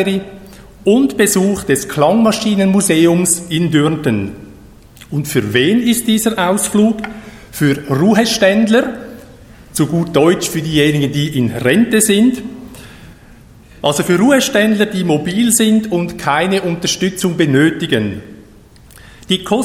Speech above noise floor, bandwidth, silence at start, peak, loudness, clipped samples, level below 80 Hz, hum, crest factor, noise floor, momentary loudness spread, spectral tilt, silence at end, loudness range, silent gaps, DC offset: 28 dB; 16.5 kHz; 0 s; 0 dBFS; -13 LUFS; under 0.1%; -44 dBFS; none; 14 dB; -41 dBFS; 11 LU; -4.5 dB/octave; 0 s; 3 LU; none; under 0.1%